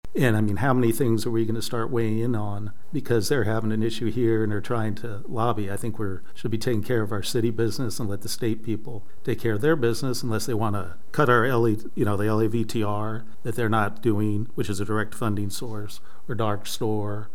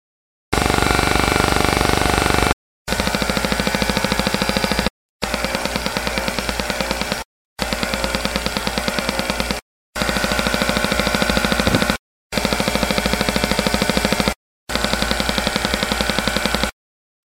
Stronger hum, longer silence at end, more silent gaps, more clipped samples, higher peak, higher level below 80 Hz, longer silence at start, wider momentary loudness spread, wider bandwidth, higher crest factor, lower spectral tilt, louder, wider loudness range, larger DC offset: neither; second, 0.1 s vs 0.55 s; second, none vs 2.53-2.85 s, 4.90-5.19 s, 7.25-7.56 s, 9.62-9.93 s, 11.99-12.30 s, 14.36-14.67 s; neither; second, -6 dBFS vs 0 dBFS; second, -56 dBFS vs -30 dBFS; second, 0 s vs 0.5 s; first, 11 LU vs 8 LU; about the same, 17 kHz vs 18 kHz; about the same, 18 dB vs 20 dB; first, -6 dB/octave vs -3.5 dB/octave; second, -26 LUFS vs -19 LUFS; about the same, 4 LU vs 4 LU; first, 5% vs under 0.1%